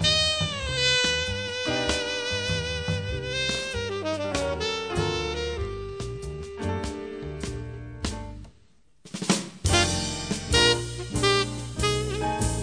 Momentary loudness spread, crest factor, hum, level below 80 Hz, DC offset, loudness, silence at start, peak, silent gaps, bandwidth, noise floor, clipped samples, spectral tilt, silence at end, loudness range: 13 LU; 20 dB; none; -40 dBFS; 0.1%; -26 LUFS; 0 s; -6 dBFS; none; 10.5 kHz; -62 dBFS; under 0.1%; -3.5 dB/octave; 0 s; 9 LU